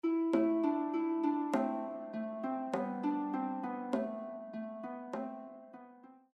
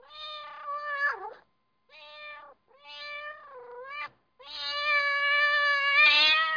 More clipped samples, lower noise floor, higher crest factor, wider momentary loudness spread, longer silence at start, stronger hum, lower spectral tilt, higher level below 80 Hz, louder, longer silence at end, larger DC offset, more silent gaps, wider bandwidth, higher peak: neither; second, -57 dBFS vs -70 dBFS; about the same, 16 dB vs 18 dB; second, 14 LU vs 25 LU; about the same, 0.05 s vs 0.1 s; neither; first, -7.5 dB/octave vs 0.5 dB/octave; second, -82 dBFS vs -70 dBFS; second, -36 LUFS vs -23 LUFS; first, 0.2 s vs 0 s; neither; neither; first, 8.8 kHz vs 5.2 kHz; second, -20 dBFS vs -12 dBFS